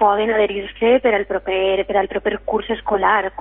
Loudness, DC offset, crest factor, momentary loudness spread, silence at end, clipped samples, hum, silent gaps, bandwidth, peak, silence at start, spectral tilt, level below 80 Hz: -18 LUFS; under 0.1%; 14 dB; 6 LU; 0 s; under 0.1%; none; none; 3.9 kHz; -4 dBFS; 0 s; -9.5 dB/octave; -44 dBFS